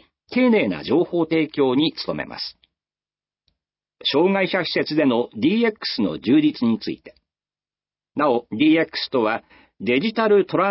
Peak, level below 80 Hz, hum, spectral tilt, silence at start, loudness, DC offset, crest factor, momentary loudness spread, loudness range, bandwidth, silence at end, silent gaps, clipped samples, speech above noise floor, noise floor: -6 dBFS; -62 dBFS; 50 Hz at -60 dBFS; -9.5 dB/octave; 0.3 s; -20 LUFS; under 0.1%; 16 dB; 10 LU; 4 LU; 5.8 kHz; 0 s; none; under 0.1%; over 70 dB; under -90 dBFS